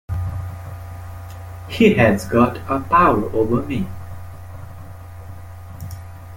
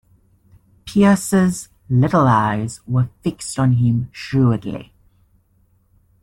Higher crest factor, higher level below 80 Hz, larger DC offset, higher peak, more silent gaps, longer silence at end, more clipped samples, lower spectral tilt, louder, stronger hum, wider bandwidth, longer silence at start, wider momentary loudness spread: about the same, 20 dB vs 16 dB; first, -42 dBFS vs -48 dBFS; neither; about the same, 0 dBFS vs -2 dBFS; neither; second, 0 s vs 1.4 s; neither; about the same, -7 dB/octave vs -7 dB/octave; about the same, -18 LUFS vs -18 LUFS; neither; first, 17 kHz vs 14 kHz; second, 0.1 s vs 0.85 s; first, 23 LU vs 11 LU